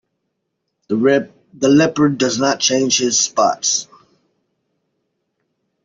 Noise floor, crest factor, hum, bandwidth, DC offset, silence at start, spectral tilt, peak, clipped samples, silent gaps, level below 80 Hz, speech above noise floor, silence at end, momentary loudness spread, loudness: -74 dBFS; 16 dB; none; 7.8 kHz; under 0.1%; 0.9 s; -3 dB/octave; -2 dBFS; under 0.1%; none; -60 dBFS; 59 dB; 2 s; 7 LU; -15 LUFS